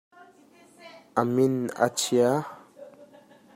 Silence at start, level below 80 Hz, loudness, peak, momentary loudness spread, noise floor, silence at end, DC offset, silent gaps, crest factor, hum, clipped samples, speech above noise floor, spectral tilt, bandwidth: 0.8 s; -74 dBFS; -25 LUFS; -6 dBFS; 11 LU; -56 dBFS; 0.5 s; under 0.1%; none; 22 dB; none; under 0.1%; 32 dB; -5 dB/octave; 16 kHz